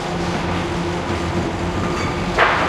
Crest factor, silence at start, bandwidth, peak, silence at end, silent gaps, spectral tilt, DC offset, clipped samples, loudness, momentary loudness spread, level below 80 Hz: 20 dB; 0 s; 13.5 kHz; 0 dBFS; 0 s; none; -5.5 dB/octave; under 0.1%; under 0.1%; -21 LUFS; 5 LU; -34 dBFS